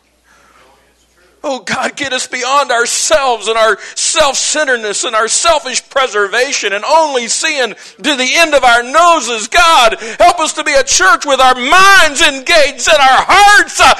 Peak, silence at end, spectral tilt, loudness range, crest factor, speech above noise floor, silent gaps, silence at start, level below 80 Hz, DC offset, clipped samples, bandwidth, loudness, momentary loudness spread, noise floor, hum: 0 dBFS; 0 s; 0 dB/octave; 5 LU; 10 dB; 40 dB; none; 1.45 s; -38 dBFS; under 0.1%; under 0.1%; 12.5 kHz; -9 LUFS; 10 LU; -50 dBFS; none